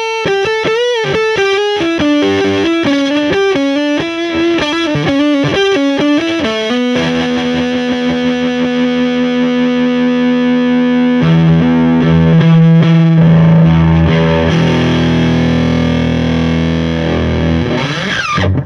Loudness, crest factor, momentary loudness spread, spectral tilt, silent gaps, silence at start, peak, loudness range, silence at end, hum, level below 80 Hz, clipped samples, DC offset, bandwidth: -11 LUFS; 10 dB; 6 LU; -7 dB/octave; none; 0 s; 0 dBFS; 5 LU; 0 s; none; -30 dBFS; under 0.1%; under 0.1%; 7.2 kHz